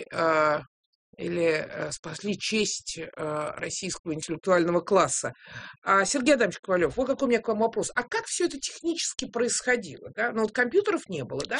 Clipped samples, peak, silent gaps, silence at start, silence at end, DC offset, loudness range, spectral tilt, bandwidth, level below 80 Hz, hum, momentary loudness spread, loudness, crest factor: under 0.1%; -8 dBFS; 0.67-1.13 s, 1.99-2.03 s, 3.99-4.04 s, 5.78-5.82 s, 6.59-6.63 s; 0 s; 0 s; under 0.1%; 5 LU; -3.5 dB/octave; 10.5 kHz; -60 dBFS; none; 11 LU; -27 LUFS; 18 dB